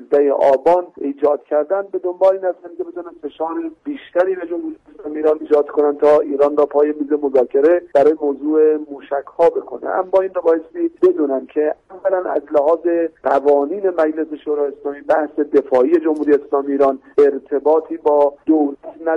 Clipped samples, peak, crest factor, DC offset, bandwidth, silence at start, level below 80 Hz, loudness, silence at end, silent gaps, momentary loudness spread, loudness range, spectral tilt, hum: under 0.1%; -4 dBFS; 14 dB; under 0.1%; 5.8 kHz; 0 s; -62 dBFS; -17 LUFS; 0 s; none; 11 LU; 5 LU; -7 dB/octave; none